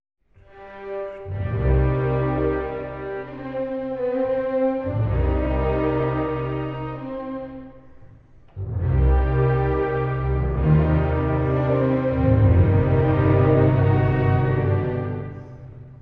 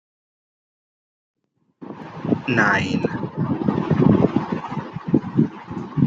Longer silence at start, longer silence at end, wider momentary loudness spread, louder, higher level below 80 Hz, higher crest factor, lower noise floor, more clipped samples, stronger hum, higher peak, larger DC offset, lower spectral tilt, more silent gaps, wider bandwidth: second, 0.55 s vs 1.8 s; about the same, 0 s vs 0 s; about the same, 14 LU vs 14 LU; about the same, -22 LUFS vs -21 LUFS; first, -30 dBFS vs -54 dBFS; about the same, 16 dB vs 20 dB; about the same, -48 dBFS vs -45 dBFS; neither; neither; second, -6 dBFS vs -2 dBFS; neither; first, -11.5 dB/octave vs -7.5 dB/octave; neither; second, 4.5 kHz vs 7.6 kHz